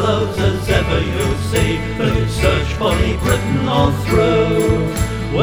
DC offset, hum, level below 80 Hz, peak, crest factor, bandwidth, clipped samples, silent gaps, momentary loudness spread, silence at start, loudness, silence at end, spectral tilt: under 0.1%; none; -24 dBFS; 0 dBFS; 16 dB; over 20 kHz; under 0.1%; none; 4 LU; 0 s; -17 LUFS; 0 s; -6 dB/octave